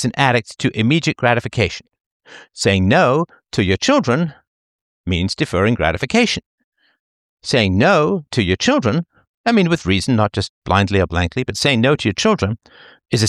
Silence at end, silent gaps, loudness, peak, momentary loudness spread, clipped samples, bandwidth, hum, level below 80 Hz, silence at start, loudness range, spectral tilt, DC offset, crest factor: 0 s; 2.00-2.20 s, 4.47-5.04 s, 6.46-6.58 s, 6.64-6.72 s, 7.00-7.37 s, 9.27-9.44 s, 10.49-10.62 s; -17 LUFS; -2 dBFS; 9 LU; under 0.1%; 12.5 kHz; none; -42 dBFS; 0 s; 2 LU; -5 dB/octave; under 0.1%; 16 dB